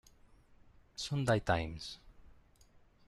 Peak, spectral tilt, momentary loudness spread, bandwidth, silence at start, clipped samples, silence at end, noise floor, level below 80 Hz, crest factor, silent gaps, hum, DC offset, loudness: -18 dBFS; -5.5 dB/octave; 18 LU; 13 kHz; 1 s; under 0.1%; 0.8 s; -64 dBFS; -56 dBFS; 22 dB; none; none; under 0.1%; -36 LUFS